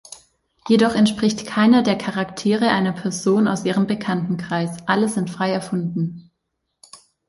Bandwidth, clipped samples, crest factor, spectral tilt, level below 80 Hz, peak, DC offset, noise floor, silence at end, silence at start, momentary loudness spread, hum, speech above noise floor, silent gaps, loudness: 11.5 kHz; under 0.1%; 16 dB; -5.5 dB/octave; -58 dBFS; -4 dBFS; under 0.1%; -76 dBFS; 0.3 s; 0.1 s; 9 LU; none; 57 dB; none; -20 LUFS